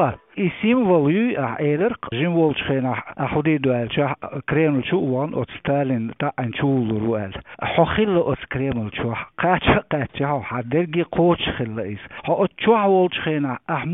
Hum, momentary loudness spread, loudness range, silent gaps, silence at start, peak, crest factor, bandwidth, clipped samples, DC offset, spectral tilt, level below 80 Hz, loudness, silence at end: none; 8 LU; 2 LU; none; 0 s; -2 dBFS; 18 dB; 4 kHz; under 0.1%; under 0.1%; -11.5 dB/octave; -46 dBFS; -21 LUFS; 0 s